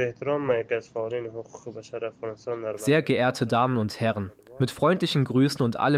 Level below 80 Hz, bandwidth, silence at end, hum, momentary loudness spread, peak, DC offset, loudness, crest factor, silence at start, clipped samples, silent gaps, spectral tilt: -62 dBFS; 15 kHz; 0 s; none; 14 LU; -8 dBFS; under 0.1%; -26 LUFS; 16 dB; 0 s; under 0.1%; none; -6.5 dB/octave